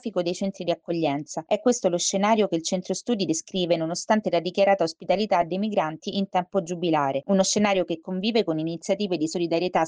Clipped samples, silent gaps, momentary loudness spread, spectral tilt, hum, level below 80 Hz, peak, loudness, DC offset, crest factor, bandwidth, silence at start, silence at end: under 0.1%; none; 6 LU; -4.5 dB/octave; none; -66 dBFS; -8 dBFS; -25 LUFS; under 0.1%; 16 dB; 10 kHz; 0.05 s; 0 s